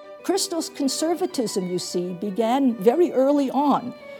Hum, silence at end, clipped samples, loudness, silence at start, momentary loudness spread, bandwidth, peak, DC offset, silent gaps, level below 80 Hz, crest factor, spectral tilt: none; 0 s; under 0.1%; -23 LUFS; 0 s; 7 LU; 19 kHz; -4 dBFS; under 0.1%; none; -74 dBFS; 18 dB; -4.5 dB/octave